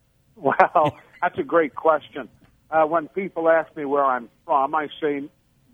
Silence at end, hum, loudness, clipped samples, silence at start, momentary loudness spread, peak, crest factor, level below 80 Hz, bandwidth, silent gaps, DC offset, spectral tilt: 0.45 s; none; -22 LUFS; under 0.1%; 0.4 s; 10 LU; 0 dBFS; 22 dB; -64 dBFS; 6.8 kHz; none; under 0.1%; -7.5 dB/octave